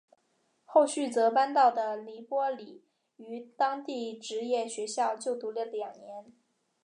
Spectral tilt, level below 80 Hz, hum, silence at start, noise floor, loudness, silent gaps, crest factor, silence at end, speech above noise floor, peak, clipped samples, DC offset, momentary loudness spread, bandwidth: -2.5 dB/octave; under -90 dBFS; none; 0.7 s; -74 dBFS; -30 LUFS; none; 20 dB; 0.6 s; 44 dB; -10 dBFS; under 0.1%; under 0.1%; 18 LU; 11 kHz